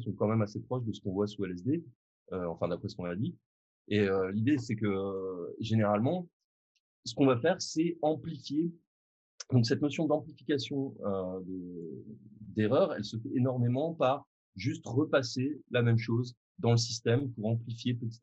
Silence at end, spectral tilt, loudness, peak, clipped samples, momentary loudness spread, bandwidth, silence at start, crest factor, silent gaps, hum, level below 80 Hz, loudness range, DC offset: 0.05 s; -6.5 dB/octave; -32 LUFS; -12 dBFS; under 0.1%; 11 LU; 8.2 kHz; 0 s; 20 dB; 1.95-2.26 s, 3.46-3.85 s, 6.33-7.03 s, 8.87-9.38 s, 14.27-14.53 s, 16.37-16.55 s; none; -72 dBFS; 3 LU; under 0.1%